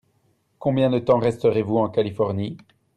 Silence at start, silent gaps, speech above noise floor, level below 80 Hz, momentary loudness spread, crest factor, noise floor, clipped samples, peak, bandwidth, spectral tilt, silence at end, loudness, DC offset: 0.6 s; none; 45 dB; -58 dBFS; 10 LU; 16 dB; -65 dBFS; under 0.1%; -6 dBFS; 10 kHz; -8.5 dB/octave; 0.4 s; -22 LUFS; under 0.1%